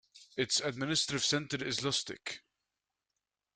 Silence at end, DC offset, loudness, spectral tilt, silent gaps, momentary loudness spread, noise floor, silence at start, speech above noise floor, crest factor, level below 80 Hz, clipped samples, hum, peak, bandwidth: 1.2 s; under 0.1%; -33 LUFS; -2.5 dB/octave; none; 13 LU; -89 dBFS; 0.15 s; 54 dB; 22 dB; -70 dBFS; under 0.1%; none; -16 dBFS; 11 kHz